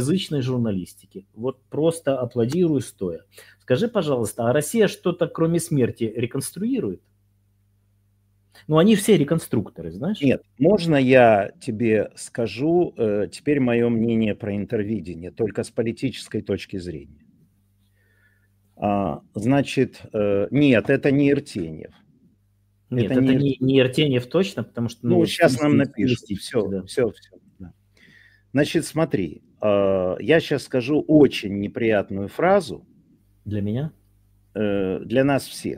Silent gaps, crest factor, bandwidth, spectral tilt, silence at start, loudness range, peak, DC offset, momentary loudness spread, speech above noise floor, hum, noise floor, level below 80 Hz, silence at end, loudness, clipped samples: none; 20 dB; 16 kHz; -6.5 dB/octave; 0 s; 7 LU; -2 dBFS; under 0.1%; 12 LU; 42 dB; 50 Hz at -55 dBFS; -63 dBFS; -54 dBFS; 0 s; -22 LUFS; under 0.1%